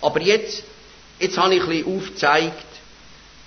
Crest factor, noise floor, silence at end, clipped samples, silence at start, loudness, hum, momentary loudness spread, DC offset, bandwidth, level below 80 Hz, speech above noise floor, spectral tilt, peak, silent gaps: 18 dB; -46 dBFS; 0.35 s; under 0.1%; 0 s; -20 LUFS; none; 14 LU; under 0.1%; 6.6 kHz; -54 dBFS; 26 dB; -4 dB/octave; -2 dBFS; none